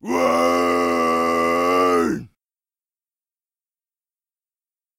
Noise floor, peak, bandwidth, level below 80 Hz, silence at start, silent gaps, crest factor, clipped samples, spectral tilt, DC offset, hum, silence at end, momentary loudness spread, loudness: under -90 dBFS; -6 dBFS; 16 kHz; -56 dBFS; 0.05 s; none; 16 dB; under 0.1%; -4.5 dB/octave; under 0.1%; none; 2.7 s; 3 LU; -18 LUFS